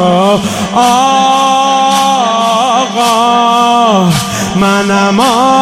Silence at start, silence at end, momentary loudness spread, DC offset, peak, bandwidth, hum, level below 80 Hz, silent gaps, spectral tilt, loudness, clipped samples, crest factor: 0 s; 0 s; 3 LU; under 0.1%; 0 dBFS; 16 kHz; none; -44 dBFS; none; -4 dB/octave; -9 LUFS; 0.4%; 8 dB